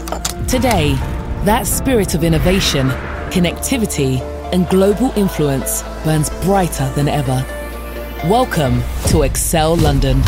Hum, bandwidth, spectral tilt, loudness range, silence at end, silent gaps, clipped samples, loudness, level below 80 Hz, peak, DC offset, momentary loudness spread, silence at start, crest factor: none; 16.5 kHz; -5 dB/octave; 2 LU; 0 s; none; under 0.1%; -16 LUFS; -24 dBFS; 0 dBFS; under 0.1%; 7 LU; 0 s; 14 dB